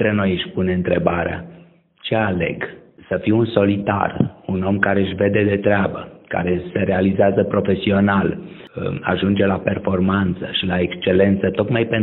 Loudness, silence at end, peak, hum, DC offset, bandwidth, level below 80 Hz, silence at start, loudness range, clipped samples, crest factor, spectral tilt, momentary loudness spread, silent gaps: -19 LUFS; 0 s; 0 dBFS; none; under 0.1%; 4.1 kHz; -48 dBFS; 0 s; 3 LU; under 0.1%; 18 dB; -5.5 dB/octave; 9 LU; none